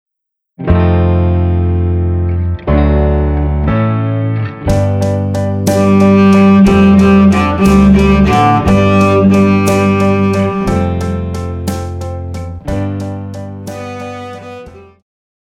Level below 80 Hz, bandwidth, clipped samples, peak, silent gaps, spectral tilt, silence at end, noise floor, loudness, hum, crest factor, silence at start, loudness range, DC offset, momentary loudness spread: -22 dBFS; 13.5 kHz; under 0.1%; 0 dBFS; none; -7.5 dB/octave; 0.7 s; -76 dBFS; -11 LUFS; none; 10 dB; 0.6 s; 13 LU; under 0.1%; 17 LU